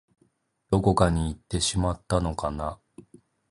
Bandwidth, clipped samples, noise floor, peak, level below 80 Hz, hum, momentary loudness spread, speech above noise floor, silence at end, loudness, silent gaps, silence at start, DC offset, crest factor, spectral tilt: 11.5 kHz; under 0.1%; -68 dBFS; -4 dBFS; -38 dBFS; none; 11 LU; 43 dB; 0.75 s; -26 LUFS; none; 0.7 s; under 0.1%; 24 dB; -5.5 dB/octave